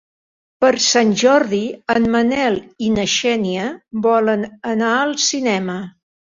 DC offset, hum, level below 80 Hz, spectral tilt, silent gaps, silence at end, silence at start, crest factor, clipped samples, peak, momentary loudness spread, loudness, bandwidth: under 0.1%; none; -52 dBFS; -3.5 dB/octave; none; 0.45 s; 0.6 s; 16 dB; under 0.1%; -2 dBFS; 9 LU; -17 LUFS; 7.6 kHz